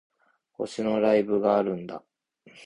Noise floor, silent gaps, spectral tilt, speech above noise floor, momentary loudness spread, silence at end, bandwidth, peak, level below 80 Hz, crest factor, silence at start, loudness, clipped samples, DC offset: -57 dBFS; none; -6.5 dB/octave; 32 dB; 15 LU; 0.05 s; 10.5 kHz; -8 dBFS; -66 dBFS; 18 dB; 0.6 s; -25 LUFS; under 0.1%; under 0.1%